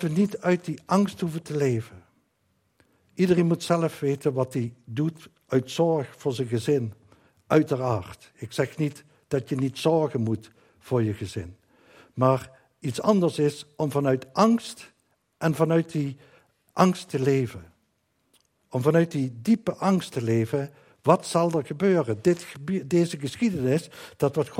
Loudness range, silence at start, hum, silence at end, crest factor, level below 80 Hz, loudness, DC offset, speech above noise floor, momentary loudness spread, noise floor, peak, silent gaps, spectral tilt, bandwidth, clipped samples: 3 LU; 0 s; none; 0 s; 22 dB; -66 dBFS; -25 LUFS; under 0.1%; 47 dB; 11 LU; -71 dBFS; -4 dBFS; none; -7 dB/octave; 16 kHz; under 0.1%